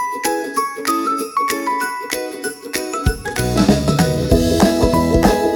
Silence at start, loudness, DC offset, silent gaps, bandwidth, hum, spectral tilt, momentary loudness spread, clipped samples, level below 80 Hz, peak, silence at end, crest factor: 0 s; -17 LUFS; under 0.1%; none; 17.5 kHz; none; -5 dB/octave; 9 LU; under 0.1%; -28 dBFS; 0 dBFS; 0 s; 16 dB